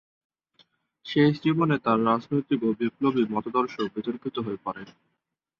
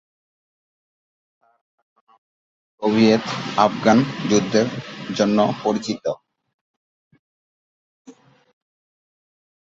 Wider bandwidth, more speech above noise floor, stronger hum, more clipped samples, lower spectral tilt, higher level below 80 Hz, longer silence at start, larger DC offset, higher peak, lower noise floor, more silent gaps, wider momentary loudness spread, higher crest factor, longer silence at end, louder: second, 6.8 kHz vs 7.8 kHz; second, 55 dB vs over 71 dB; neither; neither; first, -8.5 dB/octave vs -5.5 dB/octave; about the same, -66 dBFS vs -62 dBFS; second, 1.05 s vs 2.8 s; neither; second, -8 dBFS vs 0 dBFS; second, -80 dBFS vs under -90 dBFS; second, none vs 6.54-7.11 s, 7.19-8.05 s; about the same, 10 LU vs 11 LU; second, 18 dB vs 24 dB; second, 0.7 s vs 1.5 s; second, -26 LUFS vs -20 LUFS